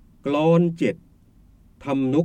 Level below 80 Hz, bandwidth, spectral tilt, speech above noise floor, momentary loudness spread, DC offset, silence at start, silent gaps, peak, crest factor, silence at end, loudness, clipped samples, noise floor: -56 dBFS; 9 kHz; -8.5 dB/octave; 33 dB; 16 LU; under 0.1%; 0.25 s; none; -6 dBFS; 16 dB; 0 s; -22 LUFS; under 0.1%; -53 dBFS